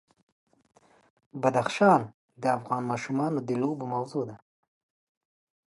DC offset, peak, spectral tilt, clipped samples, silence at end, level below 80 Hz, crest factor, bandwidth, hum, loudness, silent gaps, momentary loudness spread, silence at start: under 0.1%; -8 dBFS; -6.5 dB/octave; under 0.1%; 1.35 s; -74 dBFS; 22 dB; 11.5 kHz; none; -27 LUFS; 2.14-2.29 s; 12 LU; 1.35 s